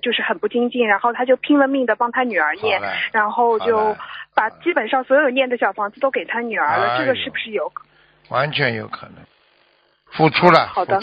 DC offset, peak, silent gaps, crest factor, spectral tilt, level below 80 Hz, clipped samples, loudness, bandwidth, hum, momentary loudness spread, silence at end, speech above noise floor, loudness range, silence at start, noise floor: under 0.1%; 0 dBFS; none; 18 dB; -7 dB/octave; -60 dBFS; under 0.1%; -18 LUFS; 7.8 kHz; none; 9 LU; 0 s; 41 dB; 4 LU; 0.05 s; -59 dBFS